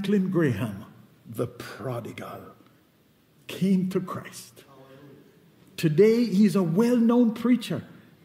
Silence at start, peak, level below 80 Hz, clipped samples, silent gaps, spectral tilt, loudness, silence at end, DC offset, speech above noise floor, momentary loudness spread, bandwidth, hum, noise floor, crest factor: 0 s; -8 dBFS; -70 dBFS; under 0.1%; none; -7.5 dB/octave; -24 LUFS; 0.4 s; under 0.1%; 38 dB; 20 LU; 16 kHz; none; -61 dBFS; 18 dB